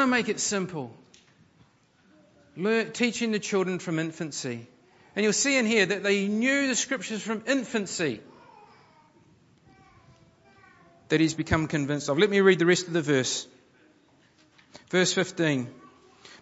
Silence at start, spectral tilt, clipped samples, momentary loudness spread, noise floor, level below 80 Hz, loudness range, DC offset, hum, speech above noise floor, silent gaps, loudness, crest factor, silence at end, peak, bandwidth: 0 s; -4 dB/octave; under 0.1%; 11 LU; -62 dBFS; -58 dBFS; 8 LU; under 0.1%; none; 36 dB; none; -26 LUFS; 22 dB; 0.05 s; -6 dBFS; 8.2 kHz